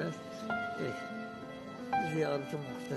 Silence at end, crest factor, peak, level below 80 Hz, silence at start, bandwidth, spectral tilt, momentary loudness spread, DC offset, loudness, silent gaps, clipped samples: 0 s; 16 dB; -20 dBFS; -70 dBFS; 0 s; 12.5 kHz; -6 dB/octave; 11 LU; under 0.1%; -37 LUFS; none; under 0.1%